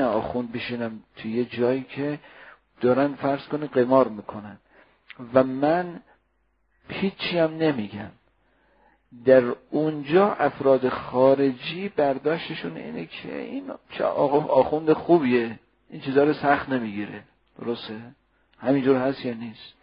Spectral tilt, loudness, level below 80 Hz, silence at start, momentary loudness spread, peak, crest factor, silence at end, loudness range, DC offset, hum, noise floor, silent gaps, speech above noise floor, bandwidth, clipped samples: -11 dB/octave; -24 LUFS; -60 dBFS; 0 s; 17 LU; -2 dBFS; 22 dB; 0.1 s; 5 LU; under 0.1%; none; -69 dBFS; none; 46 dB; 5.4 kHz; under 0.1%